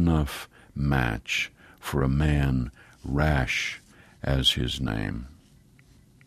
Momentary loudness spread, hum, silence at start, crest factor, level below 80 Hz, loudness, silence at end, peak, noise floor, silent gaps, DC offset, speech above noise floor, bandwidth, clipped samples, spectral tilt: 16 LU; none; 0 s; 20 dB; -36 dBFS; -26 LUFS; 0.95 s; -8 dBFS; -56 dBFS; none; under 0.1%; 31 dB; 15 kHz; under 0.1%; -5.5 dB/octave